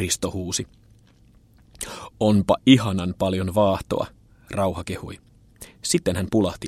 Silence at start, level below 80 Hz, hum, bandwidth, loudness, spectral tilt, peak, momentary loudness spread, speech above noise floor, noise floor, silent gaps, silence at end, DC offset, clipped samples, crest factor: 0 s; -48 dBFS; none; 15.5 kHz; -22 LUFS; -5 dB/octave; -2 dBFS; 17 LU; 33 dB; -54 dBFS; none; 0 s; under 0.1%; under 0.1%; 22 dB